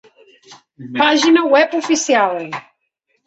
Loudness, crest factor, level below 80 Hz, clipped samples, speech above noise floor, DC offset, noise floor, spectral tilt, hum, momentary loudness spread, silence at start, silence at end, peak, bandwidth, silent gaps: -14 LUFS; 16 dB; -64 dBFS; under 0.1%; 54 dB; under 0.1%; -68 dBFS; -2.5 dB/octave; none; 16 LU; 0.5 s; 0.65 s; 0 dBFS; 8.2 kHz; none